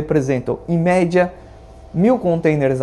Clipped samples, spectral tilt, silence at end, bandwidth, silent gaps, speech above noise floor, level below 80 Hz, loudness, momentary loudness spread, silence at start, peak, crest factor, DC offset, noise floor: under 0.1%; -8 dB/octave; 0 s; 11 kHz; none; 23 dB; -44 dBFS; -17 LUFS; 6 LU; 0 s; -2 dBFS; 16 dB; under 0.1%; -40 dBFS